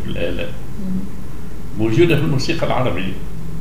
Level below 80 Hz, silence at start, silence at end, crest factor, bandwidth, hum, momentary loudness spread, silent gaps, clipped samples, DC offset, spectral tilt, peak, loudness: -34 dBFS; 0 s; 0 s; 18 dB; 16 kHz; none; 17 LU; none; under 0.1%; 10%; -6.5 dB/octave; -2 dBFS; -20 LUFS